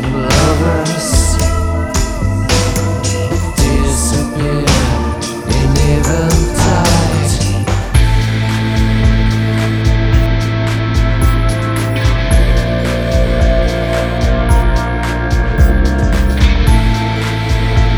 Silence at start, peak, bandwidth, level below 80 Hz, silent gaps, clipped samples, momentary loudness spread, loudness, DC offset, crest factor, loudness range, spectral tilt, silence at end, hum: 0 s; 0 dBFS; 18.5 kHz; -16 dBFS; none; under 0.1%; 4 LU; -13 LUFS; under 0.1%; 12 dB; 1 LU; -5.5 dB/octave; 0 s; none